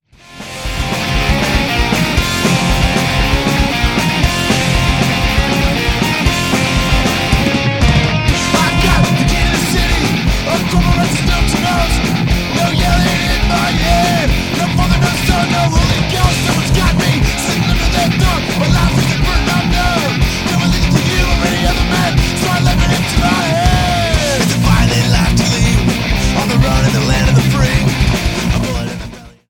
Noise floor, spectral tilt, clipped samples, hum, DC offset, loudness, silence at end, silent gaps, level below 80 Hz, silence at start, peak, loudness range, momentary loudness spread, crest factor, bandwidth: -33 dBFS; -4.5 dB/octave; under 0.1%; none; under 0.1%; -13 LUFS; 0.2 s; none; -18 dBFS; 0.3 s; 0 dBFS; 1 LU; 3 LU; 12 dB; 17.5 kHz